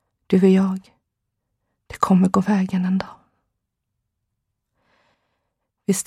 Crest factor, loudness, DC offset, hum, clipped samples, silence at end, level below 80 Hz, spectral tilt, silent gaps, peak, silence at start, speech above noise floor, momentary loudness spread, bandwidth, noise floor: 20 dB; -19 LUFS; under 0.1%; none; under 0.1%; 0.05 s; -58 dBFS; -7 dB/octave; none; -2 dBFS; 0.3 s; 61 dB; 16 LU; 14 kHz; -78 dBFS